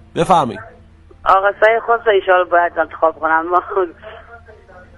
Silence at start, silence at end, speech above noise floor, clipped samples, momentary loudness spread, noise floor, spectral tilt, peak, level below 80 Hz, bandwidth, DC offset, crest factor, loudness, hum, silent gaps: 0.15 s; 0.6 s; 29 dB; under 0.1%; 9 LU; -43 dBFS; -5.5 dB/octave; 0 dBFS; -46 dBFS; 12 kHz; under 0.1%; 16 dB; -15 LUFS; none; none